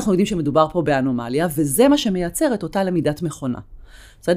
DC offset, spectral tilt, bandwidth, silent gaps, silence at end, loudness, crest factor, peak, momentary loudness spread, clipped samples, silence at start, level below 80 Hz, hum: under 0.1%; -5.5 dB/octave; 16 kHz; none; 0 s; -20 LUFS; 18 dB; -2 dBFS; 11 LU; under 0.1%; 0 s; -44 dBFS; none